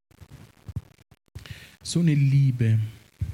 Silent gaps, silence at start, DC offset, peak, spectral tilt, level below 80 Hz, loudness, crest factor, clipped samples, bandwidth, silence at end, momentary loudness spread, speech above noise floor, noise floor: none; 0.2 s; under 0.1%; -10 dBFS; -7 dB/octave; -50 dBFS; -23 LUFS; 14 dB; under 0.1%; 11.5 kHz; 0 s; 23 LU; 28 dB; -49 dBFS